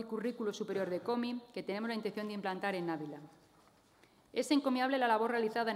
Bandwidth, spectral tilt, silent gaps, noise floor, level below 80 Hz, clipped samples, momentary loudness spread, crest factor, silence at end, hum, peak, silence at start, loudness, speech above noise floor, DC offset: 16 kHz; -5 dB/octave; none; -66 dBFS; -82 dBFS; under 0.1%; 10 LU; 18 dB; 0 s; none; -18 dBFS; 0 s; -36 LUFS; 31 dB; under 0.1%